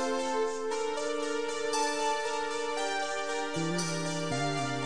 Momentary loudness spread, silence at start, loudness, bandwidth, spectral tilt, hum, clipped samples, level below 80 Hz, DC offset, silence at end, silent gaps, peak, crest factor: 3 LU; 0 s; -32 LUFS; 10.5 kHz; -3.5 dB/octave; none; under 0.1%; -68 dBFS; 0.7%; 0 s; none; -18 dBFS; 14 dB